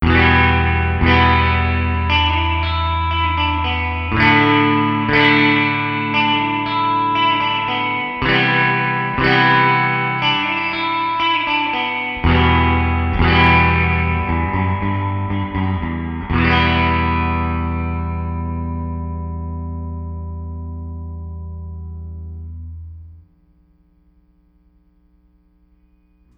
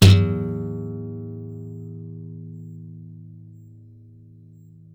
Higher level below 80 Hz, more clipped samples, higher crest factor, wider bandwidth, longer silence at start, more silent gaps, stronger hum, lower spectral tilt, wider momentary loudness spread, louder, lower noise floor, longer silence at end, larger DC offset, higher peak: first, -28 dBFS vs -46 dBFS; neither; about the same, 18 dB vs 18 dB; second, 6 kHz vs 14.5 kHz; about the same, 0 s vs 0 s; neither; first, 60 Hz at -55 dBFS vs none; first, -7.5 dB/octave vs -6 dB/octave; second, 17 LU vs 22 LU; first, -16 LUFS vs -25 LUFS; first, -55 dBFS vs -47 dBFS; first, 3.15 s vs 1.4 s; neither; first, 0 dBFS vs -6 dBFS